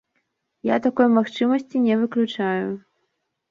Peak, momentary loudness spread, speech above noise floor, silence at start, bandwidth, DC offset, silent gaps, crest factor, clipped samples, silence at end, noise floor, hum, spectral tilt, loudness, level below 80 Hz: -6 dBFS; 10 LU; 54 dB; 0.65 s; 7 kHz; under 0.1%; none; 16 dB; under 0.1%; 0.7 s; -75 dBFS; none; -7 dB/octave; -21 LUFS; -68 dBFS